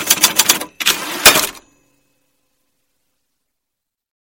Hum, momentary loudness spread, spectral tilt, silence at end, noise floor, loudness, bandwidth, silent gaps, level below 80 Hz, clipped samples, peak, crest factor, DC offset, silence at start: none; 7 LU; 0.5 dB/octave; 2.8 s; -80 dBFS; -12 LUFS; over 20 kHz; none; -50 dBFS; 0.5%; 0 dBFS; 18 dB; under 0.1%; 0 s